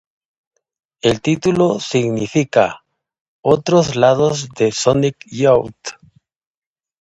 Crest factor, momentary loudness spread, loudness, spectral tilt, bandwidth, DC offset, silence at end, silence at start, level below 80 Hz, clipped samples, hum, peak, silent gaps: 18 dB; 8 LU; -16 LUFS; -5.5 dB/octave; 11 kHz; under 0.1%; 1.1 s; 1.05 s; -50 dBFS; under 0.1%; none; 0 dBFS; 3.21-3.43 s